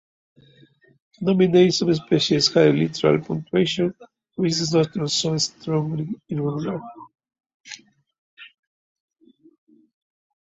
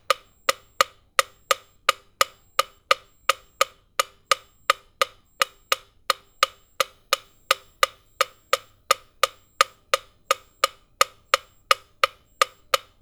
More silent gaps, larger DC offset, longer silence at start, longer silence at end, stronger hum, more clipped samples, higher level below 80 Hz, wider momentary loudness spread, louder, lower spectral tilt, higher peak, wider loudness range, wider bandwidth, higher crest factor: first, 7.54-7.64 s, 8.18-8.37 s vs none; neither; first, 1.2 s vs 0.1 s; first, 2 s vs 0.25 s; neither; neither; about the same, -60 dBFS vs -62 dBFS; first, 16 LU vs 5 LU; first, -21 LUFS vs -25 LUFS; first, -5 dB/octave vs 1.5 dB/octave; about the same, -2 dBFS vs 0 dBFS; first, 13 LU vs 2 LU; second, 8 kHz vs over 20 kHz; second, 20 dB vs 26 dB